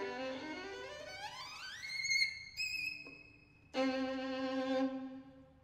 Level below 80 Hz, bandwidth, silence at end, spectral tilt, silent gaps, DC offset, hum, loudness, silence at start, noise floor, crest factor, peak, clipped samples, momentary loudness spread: -72 dBFS; 15.5 kHz; 0.1 s; -2.5 dB/octave; none; under 0.1%; none; -39 LUFS; 0 s; -62 dBFS; 20 dB; -20 dBFS; under 0.1%; 14 LU